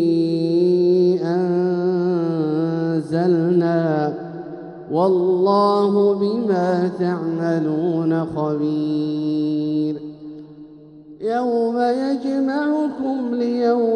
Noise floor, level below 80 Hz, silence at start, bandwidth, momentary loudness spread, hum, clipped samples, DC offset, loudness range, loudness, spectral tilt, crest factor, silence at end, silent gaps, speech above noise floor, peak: -42 dBFS; -64 dBFS; 0 s; 9.4 kHz; 9 LU; none; under 0.1%; under 0.1%; 4 LU; -19 LUFS; -8.5 dB/octave; 12 dB; 0 s; none; 23 dB; -6 dBFS